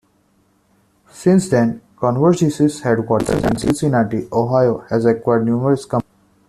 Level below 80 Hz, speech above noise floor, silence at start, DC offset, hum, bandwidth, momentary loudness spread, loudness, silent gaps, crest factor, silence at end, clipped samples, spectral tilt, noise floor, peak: -44 dBFS; 43 dB; 1.15 s; under 0.1%; none; 14 kHz; 5 LU; -17 LUFS; none; 14 dB; 0.5 s; under 0.1%; -7 dB/octave; -59 dBFS; -2 dBFS